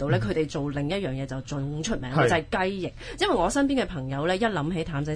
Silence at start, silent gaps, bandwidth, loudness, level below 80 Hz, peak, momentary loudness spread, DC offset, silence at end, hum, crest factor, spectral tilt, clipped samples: 0 s; none; 10.5 kHz; -27 LUFS; -44 dBFS; -8 dBFS; 9 LU; under 0.1%; 0 s; none; 18 dB; -5.5 dB/octave; under 0.1%